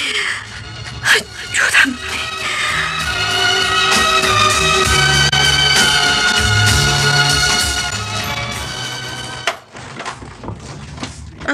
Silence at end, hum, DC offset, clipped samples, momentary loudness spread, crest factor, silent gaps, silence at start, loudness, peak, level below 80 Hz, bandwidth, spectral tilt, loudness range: 0 s; none; under 0.1%; under 0.1%; 18 LU; 16 dB; none; 0 s; -13 LUFS; 0 dBFS; -34 dBFS; 16 kHz; -2 dB/octave; 11 LU